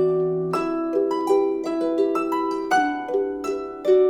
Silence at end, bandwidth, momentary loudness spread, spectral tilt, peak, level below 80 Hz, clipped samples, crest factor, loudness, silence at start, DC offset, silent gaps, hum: 0 s; 13 kHz; 5 LU; -6 dB/octave; -8 dBFS; -58 dBFS; under 0.1%; 14 dB; -23 LUFS; 0 s; under 0.1%; none; none